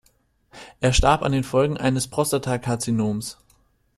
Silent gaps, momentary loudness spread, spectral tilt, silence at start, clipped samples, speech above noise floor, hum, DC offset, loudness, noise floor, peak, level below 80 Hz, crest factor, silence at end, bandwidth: none; 7 LU; -5 dB/octave; 0.55 s; under 0.1%; 42 dB; none; under 0.1%; -22 LUFS; -63 dBFS; -4 dBFS; -34 dBFS; 20 dB; 0.65 s; 14 kHz